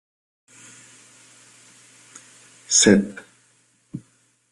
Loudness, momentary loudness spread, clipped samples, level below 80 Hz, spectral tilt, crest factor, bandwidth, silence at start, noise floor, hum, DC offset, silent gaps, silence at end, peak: -17 LUFS; 30 LU; under 0.1%; -62 dBFS; -3 dB/octave; 24 dB; 12.5 kHz; 2.7 s; -61 dBFS; none; under 0.1%; none; 0.55 s; -2 dBFS